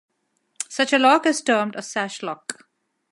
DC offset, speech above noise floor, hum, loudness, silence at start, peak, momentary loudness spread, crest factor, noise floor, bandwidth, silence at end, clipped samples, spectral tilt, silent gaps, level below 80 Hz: under 0.1%; 50 dB; none; -21 LUFS; 0.6 s; -4 dBFS; 17 LU; 20 dB; -71 dBFS; 11.5 kHz; 0.6 s; under 0.1%; -2.5 dB/octave; none; -78 dBFS